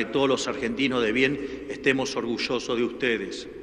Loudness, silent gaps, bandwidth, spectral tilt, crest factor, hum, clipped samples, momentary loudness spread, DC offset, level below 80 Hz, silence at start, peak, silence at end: -26 LUFS; none; 11 kHz; -4 dB/octave; 18 dB; none; under 0.1%; 6 LU; under 0.1%; -54 dBFS; 0 s; -8 dBFS; 0 s